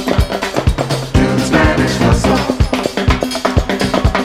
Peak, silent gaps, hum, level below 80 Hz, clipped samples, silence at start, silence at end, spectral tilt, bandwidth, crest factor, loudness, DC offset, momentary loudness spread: 0 dBFS; none; none; -20 dBFS; under 0.1%; 0 s; 0 s; -5.5 dB/octave; 16 kHz; 14 dB; -14 LUFS; under 0.1%; 4 LU